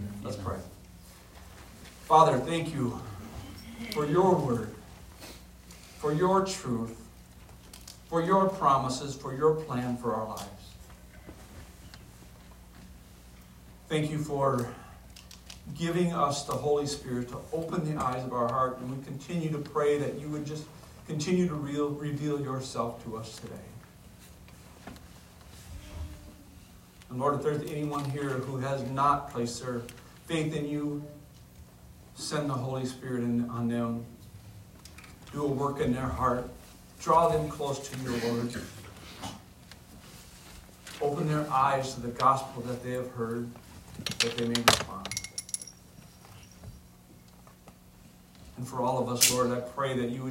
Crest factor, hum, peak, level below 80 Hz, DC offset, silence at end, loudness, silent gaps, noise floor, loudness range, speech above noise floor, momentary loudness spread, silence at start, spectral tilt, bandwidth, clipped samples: 30 dB; none; -2 dBFS; -54 dBFS; under 0.1%; 0 s; -30 LUFS; none; -54 dBFS; 10 LU; 25 dB; 24 LU; 0 s; -4.5 dB/octave; 16 kHz; under 0.1%